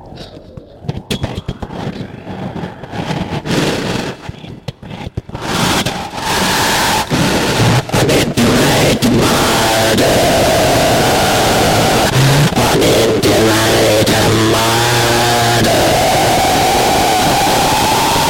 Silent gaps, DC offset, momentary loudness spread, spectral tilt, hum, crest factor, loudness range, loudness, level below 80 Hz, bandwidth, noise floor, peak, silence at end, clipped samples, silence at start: none; under 0.1%; 15 LU; -4 dB/octave; none; 10 dB; 10 LU; -11 LUFS; -32 dBFS; 17 kHz; -34 dBFS; -2 dBFS; 0 s; under 0.1%; 0 s